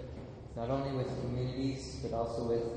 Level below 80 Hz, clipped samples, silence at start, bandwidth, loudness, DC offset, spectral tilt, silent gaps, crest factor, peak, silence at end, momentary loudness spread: -50 dBFS; under 0.1%; 0 s; 9.6 kHz; -37 LUFS; under 0.1%; -7 dB/octave; none; 16 dB; -20 dBFS; 0 s; 10 LU